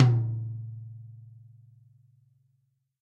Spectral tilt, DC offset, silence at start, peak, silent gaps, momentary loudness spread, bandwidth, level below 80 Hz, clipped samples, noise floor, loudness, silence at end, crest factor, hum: -9 dB/octave; under 0.1%; 0 s; -6 dBFS; none; 25 LU; 5.6 kHz; -64 dBFS; under 0.1%; -73 dBFS; -30 LUFS; 1.75 s; 24 dB; none